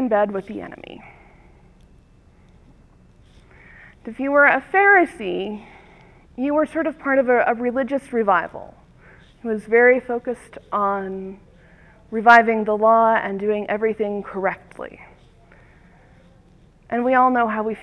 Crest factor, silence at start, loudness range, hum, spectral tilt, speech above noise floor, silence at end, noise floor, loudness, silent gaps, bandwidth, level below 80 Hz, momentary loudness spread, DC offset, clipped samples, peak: 22 dB; 0 s; 9 LU; none; -6.5 dB/octave; 33 dB; 0 s; -52 dBFS; -19 LUFS; none; 11 kHz; -54 dBFS; 21 LU; under 0.1%; under 0.1%; 0 dBFS